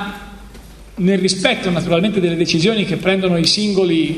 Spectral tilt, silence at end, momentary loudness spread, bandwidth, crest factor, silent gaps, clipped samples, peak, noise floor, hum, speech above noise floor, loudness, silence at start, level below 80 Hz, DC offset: -5 dB/octave; 0 s; 6 LU; 13.5 kHz; 16 dB; none; under 0.1%; 0 dBFS; -38 dBFS; none; 22 dB; -16 LUFS; 0 s; -42 dBFS; under 0.1%